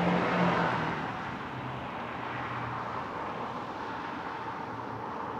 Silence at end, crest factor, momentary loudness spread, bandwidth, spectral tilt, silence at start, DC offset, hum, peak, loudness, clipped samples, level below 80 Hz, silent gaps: 0 s; 18 dB; 10 LU; 8.6 kHz; -6.5 dB/octave; 0 s; under 0.1%; none; -16 dBFS; -34 LUFS; under 0.1%; -62 dBFS; none